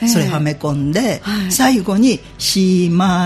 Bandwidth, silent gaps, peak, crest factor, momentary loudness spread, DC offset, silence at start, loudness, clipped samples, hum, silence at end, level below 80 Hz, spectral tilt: 15.5 kHz; none; 0 dBFS; 14 dB; 5 LU; under 0.1%; 0 s; -15 LUFS; under 0.1%; none; 0 s; -42 dBFS; -5 dB/octave